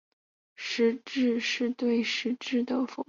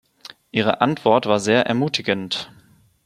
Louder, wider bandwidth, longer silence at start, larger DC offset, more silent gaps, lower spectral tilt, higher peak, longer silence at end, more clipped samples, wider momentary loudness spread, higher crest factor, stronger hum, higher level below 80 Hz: second, -28 LUFS vs -20 LUFS; second, 7.4 kHz vs 13.5 kHz; about the same, 0.6 s vs 0.55 s; neither; neither; second, -3.5 dB/octave vs -5 dB/octave; second, -14 dBFS vs -2 dBFS; second, 0.05 s vs 0.6 s; neither; second, 4 LU vs 9 LU; second, 14 dB vs 20 dB; neither; second, -76 dBFS vs -62 dBFS